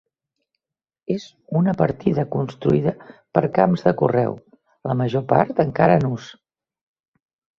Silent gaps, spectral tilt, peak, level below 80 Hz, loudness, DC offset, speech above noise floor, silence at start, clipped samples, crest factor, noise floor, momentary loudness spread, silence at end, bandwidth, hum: none; -9 dB/octave; 0 dBFS; -54 dBFS; -20 LUFS; under 0.1%; 61 dB; 1.1 s; under 0.1%; 20 dB; -81 dBFS; 11 LU; 1.25 s; 7 kHz; none